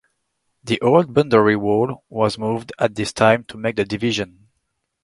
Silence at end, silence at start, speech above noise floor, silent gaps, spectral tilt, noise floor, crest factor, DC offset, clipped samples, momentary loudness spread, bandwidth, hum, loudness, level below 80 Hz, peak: 0.8 s; 0.65 s; 55 dB; none; -6 dB/octave; -73 dBFS; 20 dB; under 0.1%; under 0.1%; 9 LU; 11.5 kHz; none; -19 LUFS; -54 dBFS; 0 dBFS